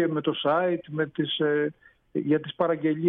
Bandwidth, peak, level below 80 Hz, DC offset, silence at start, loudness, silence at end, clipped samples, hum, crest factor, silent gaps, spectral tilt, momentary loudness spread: 3.9 kHz; -12 dBFS; -70 dBFS; under 0.1%; 0 s; -26 LUFS; 0 s; under 0.1%; none; 14 dB; none; -9.5 dB/octave; 7 LU